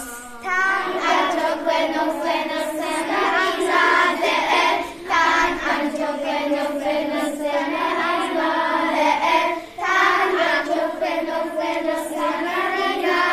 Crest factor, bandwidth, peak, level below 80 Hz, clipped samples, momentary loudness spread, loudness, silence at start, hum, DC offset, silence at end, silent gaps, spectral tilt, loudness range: 18 dB; 14.5 kHz; -4 dBFS; -54 dBFS; under 0.1%; 7 LU; -20 LUFS; 0 s; none; under 0.1%; 0 s; none; -2 dB/octave; 3 LU